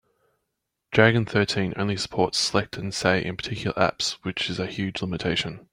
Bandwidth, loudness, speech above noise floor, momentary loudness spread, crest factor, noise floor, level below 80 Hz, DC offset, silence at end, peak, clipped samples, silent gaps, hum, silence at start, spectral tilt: 16 kHz; -24 LUFS; 56 dB; 9 LU; 22 dB; -80 dBFS; -54 dBFS; under 0.1%; 0.15 s; -4 dBFS; under 0.1%; none; none; 0.9 s; -4.5 dB/octave